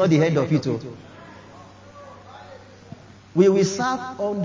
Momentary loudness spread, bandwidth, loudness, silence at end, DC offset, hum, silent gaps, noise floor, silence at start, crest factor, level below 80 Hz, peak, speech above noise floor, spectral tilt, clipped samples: 26 LU; 7.6 kHz; -21 LUFS; 0 s; under 0.1%; none; none; -45 dBFS; 0 s; 20 dB; -60 dBFS; -4 dBFS; 25 dB; -6.5 dB/octave; under 0.1%